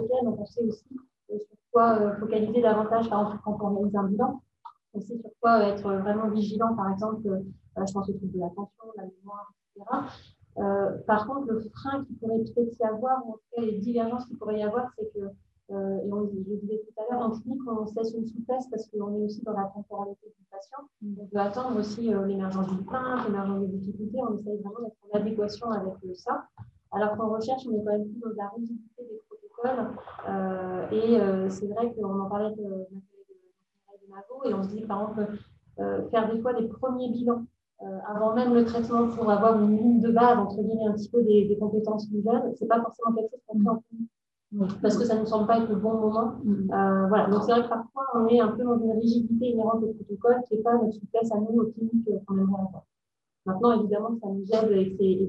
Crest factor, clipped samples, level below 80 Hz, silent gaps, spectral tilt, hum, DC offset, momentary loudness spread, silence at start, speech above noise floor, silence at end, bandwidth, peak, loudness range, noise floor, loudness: 20 dB; under 0.1%; -66 dBFS; none; -8 dB/octave; none; under 0.1%; 16 LU; 0 s; 62 dB; 0 s; 8 kHz; -8 dBFS; 9 LU; -88 dBFS; -27 LUFS